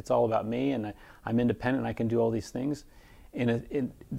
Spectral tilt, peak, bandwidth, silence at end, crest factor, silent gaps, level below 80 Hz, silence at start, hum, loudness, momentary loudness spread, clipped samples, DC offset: -7.5 dB/octave; -14 dBFS; 15 kHz; 0 s; 16 dB; none; -54 dBFS; 0.05 s; none; -30 LUFS; 10 LU; under 0.1%; under 0.1%